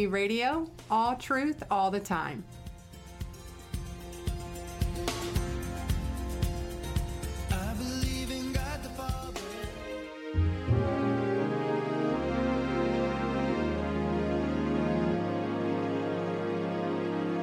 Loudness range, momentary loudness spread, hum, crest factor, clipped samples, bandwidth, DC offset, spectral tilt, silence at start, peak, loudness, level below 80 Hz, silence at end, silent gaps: 6 LU; 11 LU; none; 16 dB; under 0.1%; 16.5 kHz; under 0.1%; -6 dB/octave; 0 s; -16 dBFS; -32 LUFS; -40 dBFS; 0 s; none